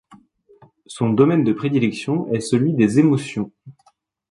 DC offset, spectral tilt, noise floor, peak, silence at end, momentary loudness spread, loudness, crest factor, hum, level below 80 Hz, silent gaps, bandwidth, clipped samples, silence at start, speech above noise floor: under 0.1%; -7 dB/octave; -60 dBFS; -2 dBFS; 0.6 s; 12 LU; -19 LUFS; 18 dB; none; -60 dBFS; none; 11.5 kHz; under 0.1%; 0.9 s; 42 dB